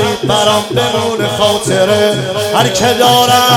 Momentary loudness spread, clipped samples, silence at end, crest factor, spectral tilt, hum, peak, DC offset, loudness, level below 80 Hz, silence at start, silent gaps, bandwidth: 6 LU; 0.5%; 0 s; 10 dB; -3.5 dB/octave; none; 0 dBFS; under 0.1%; -11 LUFS; -44 dBFS; 0 s; none; over 20 kHz